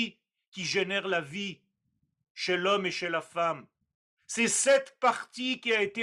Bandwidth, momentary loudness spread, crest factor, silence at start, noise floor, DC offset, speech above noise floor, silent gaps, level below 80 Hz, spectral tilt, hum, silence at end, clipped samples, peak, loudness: 13 kHz; 12 LU; 18 dB; 0 s; -78 dBFS; under 0.1%; 49 dB; 0.48-0.52 s, 2.30-2.35 s, 3.95-4.17 s; -78 dBFS; -2.5 dB/octave; none; 0 s; under 0.1%; -12 dBFS; -29 LUFS